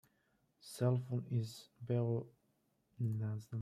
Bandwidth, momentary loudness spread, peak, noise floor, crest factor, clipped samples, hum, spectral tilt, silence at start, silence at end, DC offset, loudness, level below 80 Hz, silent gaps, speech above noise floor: 14 kHz; 16 LU; -24 dBFS; -79 dBFS; 16 dB; under 0.1%; none; -8 dB/octave; 0.65 s; 0 s; under 0.1%; -39 LUFS; -78 dBFS; none; 41 dB